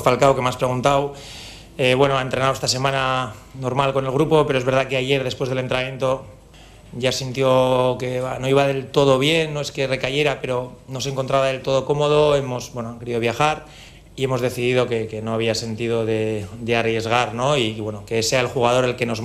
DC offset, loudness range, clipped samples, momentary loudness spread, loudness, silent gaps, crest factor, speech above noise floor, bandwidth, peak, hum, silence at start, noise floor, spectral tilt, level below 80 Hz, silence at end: under 0.1%; 3 LU; under 0.1%; 11 LU; -20 LUFS; none; 20 dB; 25 dB; 15.5 kHz; 0 dBFS; none; 0 s; -45 dBFS; -5 dB/octave; -48 dBFS; 0 s